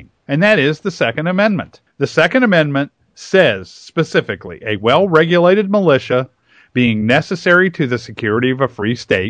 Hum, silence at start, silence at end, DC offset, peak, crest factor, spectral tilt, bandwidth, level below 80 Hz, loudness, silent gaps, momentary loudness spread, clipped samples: none; 0.3 s; 0 s; under 0.1%; 0 dBFS; 14 dB; -6.5 dB/octave; 9.4 kHz; -54 dBFS; -15 LUFS; none; 11 LU; under 0.1%